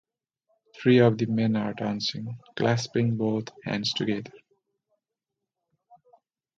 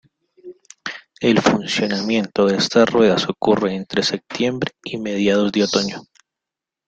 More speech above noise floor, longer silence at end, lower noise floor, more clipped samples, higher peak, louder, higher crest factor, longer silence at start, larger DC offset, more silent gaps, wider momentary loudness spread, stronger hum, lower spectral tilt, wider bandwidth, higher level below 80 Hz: second, 61 dB vs 68 dB; first, 2.2 s vs 0.85 s; about the same, -86 dBFS vs -86 dBFS; neither; second, -8 dBFS vs -2 dBFS; second, -26 LUFS vs -18 LUFS; about the same, 20 dB vs 18 dB; first, 0.75 s vs 0.45 s; neither; neither; about the same, 13 LU vs 12 LU; neither; first, -6 dB/octave vs -4.5 dB/octave; second, 7.8 kHz vs 9 kHz; second, -66 dBFS vs -56 dBFS